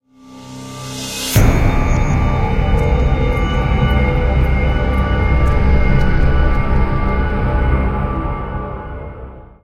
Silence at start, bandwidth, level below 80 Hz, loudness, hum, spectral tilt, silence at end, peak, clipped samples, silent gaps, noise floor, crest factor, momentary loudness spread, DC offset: 0.25 s; 16 kHz; -16 dBFS; -17 LUFS; none; -6 dB/octave; 0.15 s; 0 dBFS; under 0.1%; none; -38 dBFS; 14 dB; 13 LU; under 0.1%